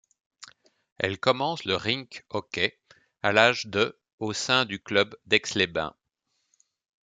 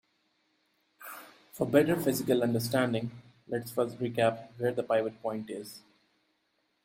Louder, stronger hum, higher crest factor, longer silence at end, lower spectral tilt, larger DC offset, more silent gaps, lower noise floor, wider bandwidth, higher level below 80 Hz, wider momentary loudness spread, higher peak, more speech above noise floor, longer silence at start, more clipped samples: first, -26 LUFS vs -30 LUFS; neither; about the same, 26 dB vs 22 dB; about the same, 1.15 s vs 1.05 s; second, -3.5 dB/octave vs -5.5 dB/octave; neither; first, 0.92-0.96 s, 4.13-4.18 s vs none; about the same, -78 dBFS vs -76 dBFS; second, 9.4 kHz vs 16.5 kHz; about the same, -66 dBFS vs -70 dBFS; second, 11 LU vs 19 LU; first, -2 dBFS vs -10 dBFS; first, 51 dB vs 46 dB; second, 0.4 s vs 1 s; neither